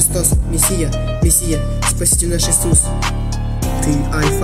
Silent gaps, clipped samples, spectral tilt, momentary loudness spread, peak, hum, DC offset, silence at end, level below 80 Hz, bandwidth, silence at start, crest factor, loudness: none; under 0.1%; -4 dB/octave; 7 LU; 0 dBFS; none; 0.2%; 0 s; -20 dBFS; 16 kHz; 0 s; 14 dB; -15 LUFS